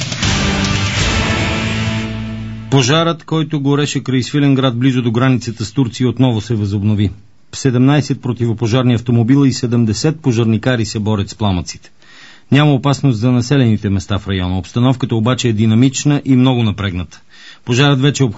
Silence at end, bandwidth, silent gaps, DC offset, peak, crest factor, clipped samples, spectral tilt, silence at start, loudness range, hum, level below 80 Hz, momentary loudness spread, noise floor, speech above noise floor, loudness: 0 s; 8 kHz; none; 0.7%; 0 dBFS; 14 dB; under 0.1%; -6 dB/octave; 0 s; 2 LU; none; -34 dBFS; 7 LU; -42 dBFS; 28 dB; -14 LUFS